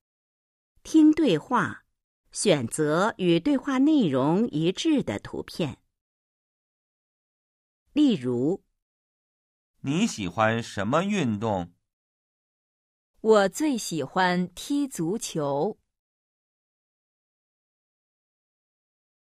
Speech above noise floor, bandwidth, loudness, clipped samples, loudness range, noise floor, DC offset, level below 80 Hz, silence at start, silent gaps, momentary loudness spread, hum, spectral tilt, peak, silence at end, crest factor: over 66 dB; 14 kHz; -25 LUFS; under 0.1%; 8 LU; under -90 dBFS; under 0.1%; -62 dBFS; 0.85 s; 2.04-2.24 s, 6.01-7.86 s, 8.82-9.74 s, 11.93-13.14 s; 11 LU; none; -5.5 dB/octave; -8 dBFS; 3.65 s; 18 dB